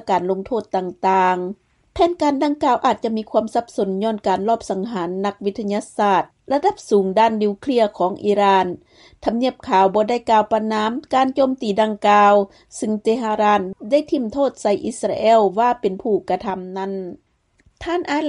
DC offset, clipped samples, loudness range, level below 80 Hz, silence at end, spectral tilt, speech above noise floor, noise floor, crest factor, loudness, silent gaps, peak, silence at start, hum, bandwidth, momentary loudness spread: under 0.1%; under 0.1%; 3 LU; -54 dBFS; 0 s; -5.5 dB/octave; 40 dB; -59 dBFS; 14 dB; -19 LUFS; none; -4 dBFS; 0.05 s; none; 11.5 kHz; 10 LU